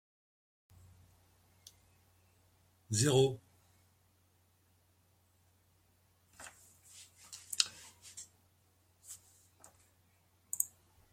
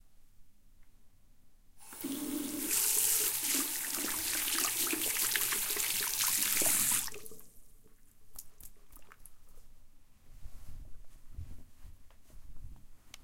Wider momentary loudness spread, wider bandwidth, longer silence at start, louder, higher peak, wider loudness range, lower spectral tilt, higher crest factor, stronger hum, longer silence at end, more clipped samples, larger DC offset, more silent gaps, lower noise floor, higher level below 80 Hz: first, 27 LU vs 24 LU; about the same, 16.5 kHz vs 17 kHz; first, 2.9 s vs 0.05 s; second, -34 LUFS vs -30 LUFS; about the same, -8 dBFS vs -10 dBFS; first, 12 LU vs 5 LU; first, -3.5 dB/octave vs 0 dB/octave; first, 34 dB vs 26 dB; neither; first, 0.45 s vs 0 s; neither; neither; neither; first, -72 dBFS vs -58 dBFS; second, -74 dBFS vs -54 dBFS